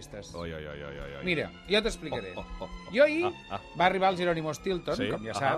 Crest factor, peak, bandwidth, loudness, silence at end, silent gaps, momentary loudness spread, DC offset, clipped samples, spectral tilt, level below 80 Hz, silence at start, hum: 20 dB; -10 dBFS; 13.5 kHz; -29 LUFS; 0 s; none; 16 LU; under 0.1%; under 0.1%; -5 dB/octave; -50 dBFS; 0 s; none